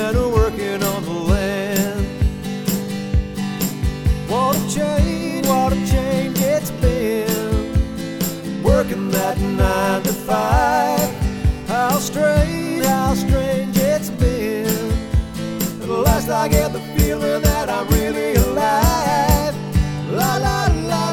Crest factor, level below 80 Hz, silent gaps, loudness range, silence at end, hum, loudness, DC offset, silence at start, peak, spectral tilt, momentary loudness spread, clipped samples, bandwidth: 16 dB; -24 dBFS; none; 3 LU; 0 s; none; -19 LUFS; under 0.1%; 0 s; -2 dBFS; -5.5 dB/octave; 5 LU; under 0.1%; over 20 kHz